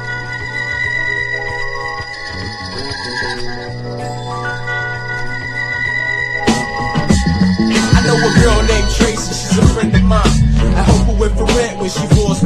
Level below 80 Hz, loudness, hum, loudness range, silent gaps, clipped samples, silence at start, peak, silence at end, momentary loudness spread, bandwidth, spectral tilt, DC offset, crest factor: -20 dBFS; -15 LUFS; none; 9 LU; none; under 0.1%; 0 s; 0 dBFS; 0 s; 11 LU; 12.5 kHz; -5 dB/octave; under 0.1%; 14 dB